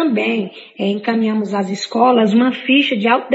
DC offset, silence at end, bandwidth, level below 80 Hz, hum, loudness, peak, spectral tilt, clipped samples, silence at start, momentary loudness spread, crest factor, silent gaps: under 0.1%; 0 s; 8 kHz; -72 dBFS; none; -16 LUFS; -2 dBFS; -5.5 dB/octave; under 0.1%; 0 s; 8 LU; 14 dB; none